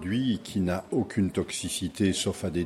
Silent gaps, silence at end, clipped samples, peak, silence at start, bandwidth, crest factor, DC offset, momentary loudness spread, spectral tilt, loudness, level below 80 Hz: none; 0 s; under 0.1%; -14 dBFS; 0 s; 13.5 kHz; 16 dB; under 0.1%; 4 LU; -5 dB/octave; -29 LUFS; -58 dBFS